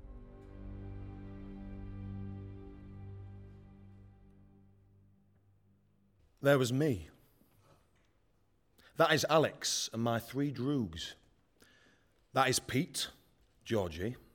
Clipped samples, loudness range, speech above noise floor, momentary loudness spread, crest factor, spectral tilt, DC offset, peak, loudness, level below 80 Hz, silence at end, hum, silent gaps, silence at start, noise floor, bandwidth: under 0.1%; 17 LU; 41 dB; 23 LU; 24 dB; -4.5 dB/octave; under 0.1%; -14 dBFS; -33 LUFS; -58 dBFS; 0.15 s; none; none; 0 s; -73 dBFS; 18 kHz